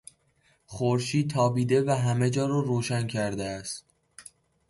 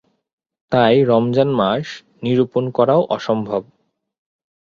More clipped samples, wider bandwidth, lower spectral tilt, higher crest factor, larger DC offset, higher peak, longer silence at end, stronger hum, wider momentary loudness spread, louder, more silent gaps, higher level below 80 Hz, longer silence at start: neither; first, 11.5 kHz vs 7.4 kHz; second, -6 dB/octave vs -7.5 dB/octave; about the same, 16 dB vs 16 dB; neither; second, -12 dBFS vs -2 dBFS; second, 0.5 s vs 1.05 s; neither; first, 18 LU vs 11 LU; second, -27 LUFS vs -17 LUFS; neither; about the same, -60 dBFS vs -58 dBFS; about the same, 0.7 s vs 0.7 s